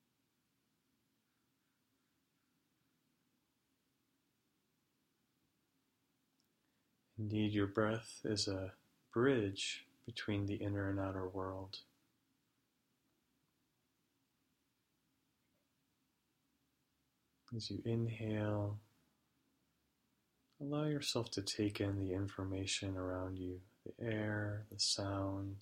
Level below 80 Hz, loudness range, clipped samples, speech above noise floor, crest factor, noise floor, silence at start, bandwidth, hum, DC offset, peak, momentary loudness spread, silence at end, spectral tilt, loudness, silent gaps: -72 dBFS; 9 LU; under 0.1%; 43 dB; 22 dB; -83 dBFS; 7.15 s; 15.5 kHz; none; under 0.1%; -22 dBFS; 12 LU; 0 s; -5 dB/octave; -40 LUFS; none